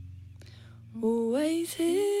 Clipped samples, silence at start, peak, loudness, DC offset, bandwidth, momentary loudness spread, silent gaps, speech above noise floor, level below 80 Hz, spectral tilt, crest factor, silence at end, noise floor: under 0.1%; 0 s; -18 dBFS; -28 LUFS; under 0.1%; 16 kHz; 22 LU; none; 22 dB; -66 dBFS; -5 dB/octave; 12 dB; 0 s; -49 dBFS